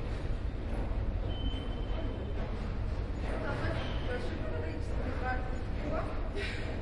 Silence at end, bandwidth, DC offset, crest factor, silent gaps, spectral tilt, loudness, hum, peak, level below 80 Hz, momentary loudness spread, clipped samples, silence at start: 0 s; 11 kHz; under 0.1%; 14 dB; none; -7 dB/octave; -37 LUFS; none; -20 dBFS; -36 dBFS; 3 LU; under 0.1%; 0 s